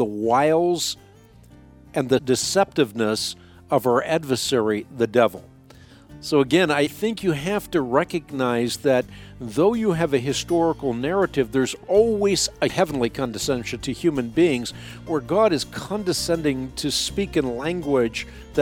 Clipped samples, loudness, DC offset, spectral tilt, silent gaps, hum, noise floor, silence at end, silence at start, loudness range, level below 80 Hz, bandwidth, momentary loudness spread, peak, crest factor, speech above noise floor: under 0.1%; -22 LUFS; under 0.1%; -4.5 dB/octave; none; none; -49 dBFS; 0 s; 0 s; 2 LU; -48 dBFS; 18 kHz; 8 LU; -4 dBFS; 18 dB; 27 dB